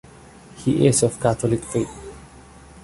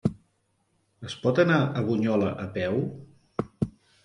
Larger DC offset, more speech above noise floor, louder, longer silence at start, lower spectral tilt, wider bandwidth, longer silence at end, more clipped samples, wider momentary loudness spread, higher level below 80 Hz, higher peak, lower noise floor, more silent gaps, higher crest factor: neither; second, 25 dB vs 46 dB; first, -21 LUFS vs -27 LUFS; first, 0.55 s vs 0.05 s; second, -5.5 dB/octave vs -7.5 dB/octave; about the same, 11.5 kHz vs 11 kHz; second, 0.05 s vs 0.35 s; neither; about the same, 16 LU vs 14 LU; first, -46 dBFS vs -54 dBFS; first, -4 dBFS vs -8 dBFS; second, -45 dBFS vs -71 dBFS; neither; about the same, 20 dB vs 20 dB